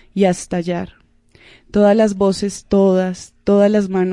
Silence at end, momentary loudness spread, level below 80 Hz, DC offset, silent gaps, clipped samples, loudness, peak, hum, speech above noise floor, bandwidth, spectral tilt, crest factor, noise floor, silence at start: 0 s; 11 LU; -46 dBFS; under 0.1%; none; under 0.1%; -16 LUFS; -2 dBFS; none; 34 dB; 11.5 kHz; -6.5 dB/octave; 14 dB; -49 dBFS; 0.15 s